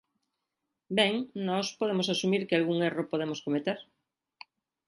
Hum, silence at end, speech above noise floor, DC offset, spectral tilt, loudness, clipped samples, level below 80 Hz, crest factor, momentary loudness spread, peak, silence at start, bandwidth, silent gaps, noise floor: none; 1.05 s; 56 dB; under 0.1%; -5 dB/octave; -30 LUFS; under 0.1%; -78 dBFS; 22 dB; 6 LU; -10 dBFS; 0.9 s; 11.5 kHz; none; -85 dBFS